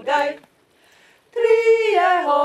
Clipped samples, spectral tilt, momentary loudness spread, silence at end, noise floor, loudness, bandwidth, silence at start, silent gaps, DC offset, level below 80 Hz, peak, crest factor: under 0.1%; -2.5 dB/octave; 14 LU; 0 s; -56 dBFS; -17 LUFS; 11 kHz; 0 s; none; under 0.1%; -70 dBFS; -6 dBFS; 14 dB